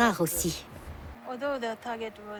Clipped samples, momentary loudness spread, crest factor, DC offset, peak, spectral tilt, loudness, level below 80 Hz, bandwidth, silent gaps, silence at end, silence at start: under 0.1%; 17 LU; 20 dB; under 0.1%; -12 dBFS; -3.5 dB/octave; -31 LUFS; -50 dBFS; over 20 kHz; none; 0 s; 0 s